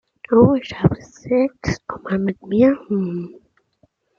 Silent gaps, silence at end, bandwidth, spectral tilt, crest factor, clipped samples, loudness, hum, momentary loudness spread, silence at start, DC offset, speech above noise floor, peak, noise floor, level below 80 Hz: none; 0.9 s; 7.2 kHz; -8 dB/octave; 18 dB; under 0.1%; -19 LUFS; none; 13 LU; 0.3 s; under 0.1%; 44 dB; -2 dBFS; -62 dBFS; -46 dBFS